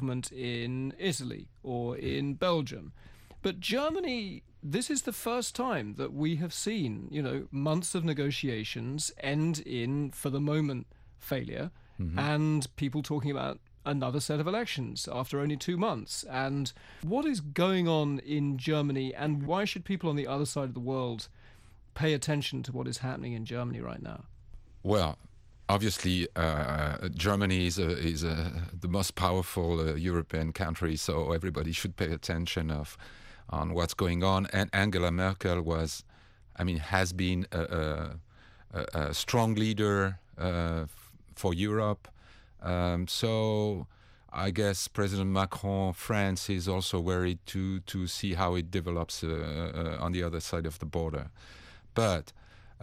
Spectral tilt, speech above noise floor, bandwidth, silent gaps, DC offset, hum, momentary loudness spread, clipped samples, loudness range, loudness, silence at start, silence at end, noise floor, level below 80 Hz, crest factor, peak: -5.5 dB/octave; 25 dB; 16 kHz; none; under 0.1%; none; 10 LU; under 0.1%; 3 LU; -32 LUFS; 0 s; 0.05 s; -56 dBFS; -48 dBFS; 22 dB; -10 dBFS